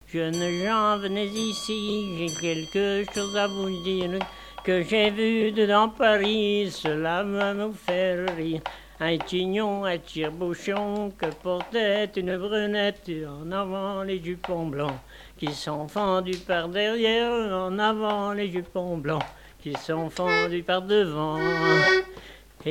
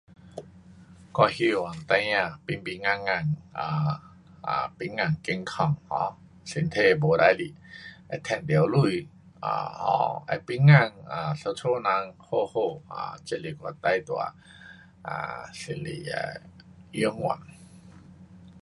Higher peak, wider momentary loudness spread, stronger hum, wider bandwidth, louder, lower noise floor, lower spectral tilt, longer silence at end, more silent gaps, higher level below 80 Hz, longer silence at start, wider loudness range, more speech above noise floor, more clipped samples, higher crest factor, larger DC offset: second, -6 dBFS vs -2 dBFS; second, 10 LU vs 16 LU; neither; first, 16.5 kHz vs 11.5 kHz; about the same, -26 LUFS vs -27 LUFS; second, -46 dBFS vs -50 dBFS; second, -4.5 dB/octave vs -6.5 dB/octave; about the same, 0 s vs 0.05 s; neither; first, -54 dBFS vs -60 dBFS; second, 0.1 s vs 0.25 s; second, 5 LU vs 9 LU; second, 20 dB vs 24 dB; neither; about the same, 20 dB vs 24 dB; neither